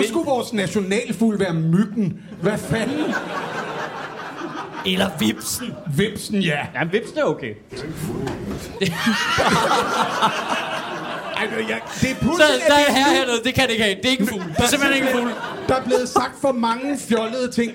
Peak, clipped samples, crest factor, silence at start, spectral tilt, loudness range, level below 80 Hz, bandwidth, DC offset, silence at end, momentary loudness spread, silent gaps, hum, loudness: -4 dBFS; under 0.1%; 18 dB; 0 s; -4 dB/octave; 7 LU; -48 dBFS; 17 kHz; under 0.1%; 0 s; 12 LU; none; none; -20 LUFS